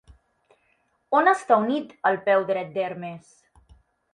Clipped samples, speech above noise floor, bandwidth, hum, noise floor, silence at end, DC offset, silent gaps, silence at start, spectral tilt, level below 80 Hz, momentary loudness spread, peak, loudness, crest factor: under 0.1%; 45 dB; 11 kHz; none; -68 dBFS; 0.95 s; under 0.1%; none; 1.1 s; -5.5 dB/octave; -62 dBFS; 15 LU; -4 dBFS; -23 LUFS; 20 dB